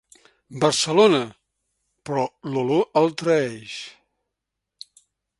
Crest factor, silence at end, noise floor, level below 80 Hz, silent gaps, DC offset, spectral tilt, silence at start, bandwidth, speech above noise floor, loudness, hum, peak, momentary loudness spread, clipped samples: 20 dB; 1.5 s; -83 dBFS; -66 dBFS; none; under 0.1%; -4.5 dB/octave; 0.5 s; 11.5 kHz; 62 dB; -21 LUFS; none; -4 dBFS; 18 LU; under 0.1%